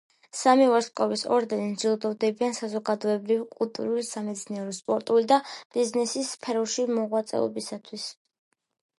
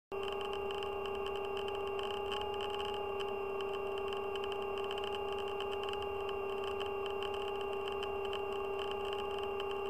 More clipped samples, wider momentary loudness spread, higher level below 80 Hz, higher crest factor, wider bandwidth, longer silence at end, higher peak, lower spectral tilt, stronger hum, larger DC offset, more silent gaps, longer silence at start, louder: neither; first, 12 LU vs 1 LU; second, -80 dBFS vs -60 dBFS; first, 20 dB vs 14 dB; second, 11.5 kHz vs 15 kHz; first, 0.85 s vs 0 s; first, -8 dBFS vs -24 dBFS; about the same, -4 dB/octave vs -4.5 dB/octave; neither; second, under 0.1% vs 0.2%; first, 5.65-5.70 s vs none; first, 0.35 s vs 0.1 s; first, -26 LUFS vs -39 LUFS